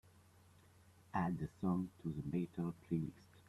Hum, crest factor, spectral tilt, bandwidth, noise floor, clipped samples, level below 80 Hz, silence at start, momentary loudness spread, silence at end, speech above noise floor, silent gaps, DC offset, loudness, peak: none; 20 dB; -9 dB/octave; 12.5 kHz; -66 dBFS; under 0.1%; -68 dBFS; 1.15 s; 5 LU; 0.1 s; 25 dB; none; under 0.1%; -42 LUFS; -24 dBFS